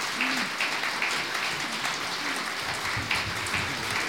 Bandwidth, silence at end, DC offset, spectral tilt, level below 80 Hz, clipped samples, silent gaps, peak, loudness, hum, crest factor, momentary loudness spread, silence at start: 18 kHz; 0 s; 0.1%; -2 dB/octave; -56 dBFS; under 0.1%; none; -10 dBFS; -27 LUFS; none; 20 dB; 3 LU; 0 s